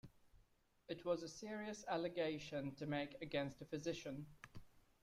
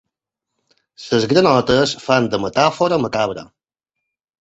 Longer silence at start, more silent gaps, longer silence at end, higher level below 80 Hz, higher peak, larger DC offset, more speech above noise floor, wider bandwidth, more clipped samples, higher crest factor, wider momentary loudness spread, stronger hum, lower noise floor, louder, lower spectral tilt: second, 0.05 s vs 1 s; neither; second, 0.2 s vs 0.95 s; second, -72 dBFS vs -52 dBFS; second, -28 dBFS vs -2 dBFS; neither; second, 30 dB vs 65 dB; first, 15 kHz vs 8.2 kHz; neither; about the same, 18 dB vs 18 dB; first, 11 LU vs 8 LU; neither; second, -75 dBFS vs -81 dBFS; second, -46 LUFS vs -16 LUFS; about the same, -5 dB/octave vs -5 dB/octave